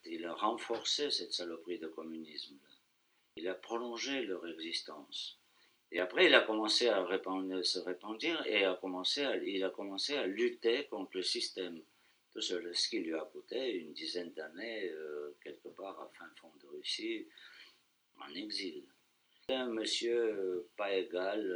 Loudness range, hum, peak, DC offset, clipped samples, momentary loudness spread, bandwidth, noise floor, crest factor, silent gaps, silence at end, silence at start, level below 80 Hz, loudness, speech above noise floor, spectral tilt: 12 LU; none; -10 dBFS; under 0.1%; under 0.1%; 16 LU; over 20 kHz; -75 dBFS; 28 dB; none; 0 s; 0.05 s; -88 dBFS; -36 LUFS; 39 dB; -2 dB/octave